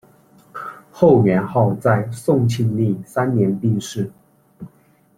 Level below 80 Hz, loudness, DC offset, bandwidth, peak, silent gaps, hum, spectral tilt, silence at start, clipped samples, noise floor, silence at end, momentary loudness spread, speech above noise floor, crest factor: -54 dBFS; -18 LUFS; under 0.1%; 14.5 kHz; -2 dBFS; none; none; -7.5 dB/octave; 0.55 s; under 0.1%; -55 dBFS; 0.5 s; 18 LU; 38 dB; 18 dB